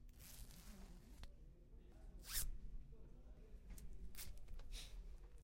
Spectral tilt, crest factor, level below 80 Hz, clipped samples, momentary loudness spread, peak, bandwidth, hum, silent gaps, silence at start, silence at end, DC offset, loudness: -2.5 dB/octave; 24 dB; -56 dBFS; under 0.1%; 18 LU; -28 dBFS; 16.5 kHz; none; none; 0 s; 0 s; under 0.1%; -55 LUFS